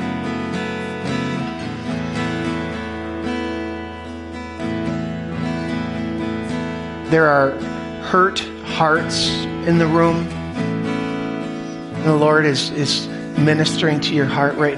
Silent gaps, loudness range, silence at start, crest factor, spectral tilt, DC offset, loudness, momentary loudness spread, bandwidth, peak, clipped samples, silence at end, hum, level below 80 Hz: none; 7 LU; 0 s; 16 dB; -5.5 dB/octave; under 0.1%; -20 LUFS; 11 LU; 11.5 kHz; -4 dBFS; under 0.1%; 0 s; none; -42 dBFS